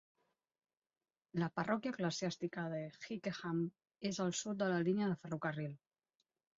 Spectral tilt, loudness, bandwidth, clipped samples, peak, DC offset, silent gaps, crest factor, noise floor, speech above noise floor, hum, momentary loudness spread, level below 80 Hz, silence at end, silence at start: -5.5 dB/octave; -40 LUFS; 7.6 kHz; under 0.1%; -22 dBFS; under 0.1%; none; 20 dB; under -90 dBFS; over 51 dB; none; 9 LU; -80 dBFS; 0.8 s; 1.35 s